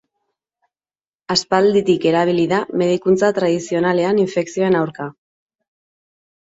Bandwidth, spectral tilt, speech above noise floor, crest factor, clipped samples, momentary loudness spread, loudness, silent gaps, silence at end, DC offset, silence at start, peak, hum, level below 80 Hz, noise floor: 8 kHz; -5.5 dB/octave; over 74 dB; 16 dB; under 0.1%; 5 LU; -17 LUFS; none; 1.4 s; under 0.1%; 1.3 s; -2 dBFS; none; -60 dBFS; under -90 dBFS